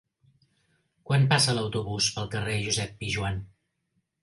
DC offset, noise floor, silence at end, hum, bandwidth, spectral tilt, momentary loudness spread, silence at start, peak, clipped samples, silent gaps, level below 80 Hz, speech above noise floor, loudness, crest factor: under 0.1%; -76 dBFS; 0.75 s; none; 11.5 kHz; -4 dB/octave; 9 LU; 1.05 s; -6 dBFS; under 0.1%; none; -52 dBFS; 50 dB; -26 LUFS; 22 dB